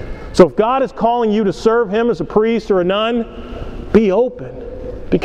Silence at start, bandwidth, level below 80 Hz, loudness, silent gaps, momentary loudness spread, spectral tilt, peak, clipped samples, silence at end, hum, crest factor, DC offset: 0 s; 9.8 kHz; -34 dBFS; -15 LUFS; none; 17 LU; -7 dB/octave; 0 dBFS; 0.1%; 0 s; none; 16 dB; under 0.1%